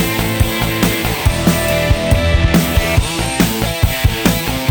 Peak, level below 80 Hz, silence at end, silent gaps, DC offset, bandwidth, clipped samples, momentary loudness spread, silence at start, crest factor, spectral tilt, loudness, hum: 0 dBFS; -22 dBFS; 0 s; none; under 0.1%; over 20 kHz; under 0.1%; 3 LU; 0 s; 14 dB; -4.5 dB/octave; -15 LUFS; none